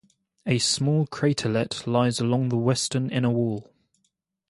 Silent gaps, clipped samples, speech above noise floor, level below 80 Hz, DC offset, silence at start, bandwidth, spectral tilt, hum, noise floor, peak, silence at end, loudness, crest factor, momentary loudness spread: none; under 0.1%; 51 dB; -60 dBFS; under 0.1%; 0.45 s; 11.5 kHz; -5 dB/octave; none; -75 dBFS; -8 dBFS; 0.9 s; -24 LUFS; 18 dB; 5 LU